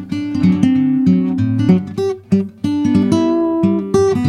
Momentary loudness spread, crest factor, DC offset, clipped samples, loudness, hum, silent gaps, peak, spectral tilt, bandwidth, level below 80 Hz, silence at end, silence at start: 5 LU; 14 dB; under 0.1%; under 0.1%; -15 LUFS; none; none; 0 dBFS; -8 dB/octave; 10.5 kHz; -48 dBFS; 0 s; 0 s